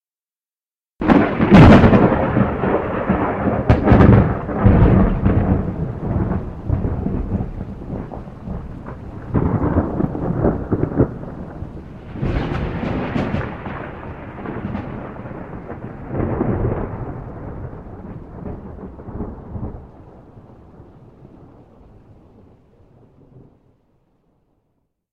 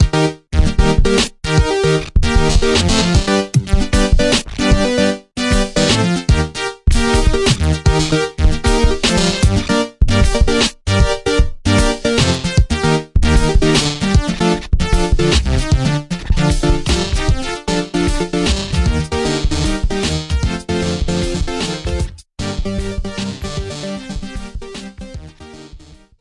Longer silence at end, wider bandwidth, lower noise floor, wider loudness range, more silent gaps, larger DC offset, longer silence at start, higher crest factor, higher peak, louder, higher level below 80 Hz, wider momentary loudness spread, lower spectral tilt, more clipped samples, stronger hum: first, 3.85 s vs 0.45 s; second, 7.4 kHz vs 11.5 kHz; first, under -90 dBFS vs -39 dBFS; first, 20 LU vs 7 LU; neither; first, 0.2% vs under 0.1%; first, 1 s vs 0 s; about the same, 18 dB vs 14 dB; about the same, 0 dBFS vs 0 dBFS; about the same, -17 LUFS vs -16 LUFS; second, -28 dBFS vs -18 dBFS; first, 21 LU vs 10 LU; first, -9.5 dB/octave vs -5 dB/octave; neither; neither